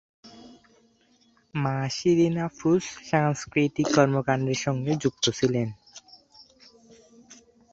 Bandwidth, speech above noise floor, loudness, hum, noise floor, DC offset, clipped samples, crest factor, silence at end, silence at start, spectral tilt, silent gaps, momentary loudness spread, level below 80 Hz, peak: 8 kHz; 39 dB; -25 LUFS; none; -63 dBFS; under 0.1%; under 0.1%; 24 dB; 0.4 s; 0.25 s; -5.5 dB/octave; none; 8 LU; -60 dBFS; -4 dBFS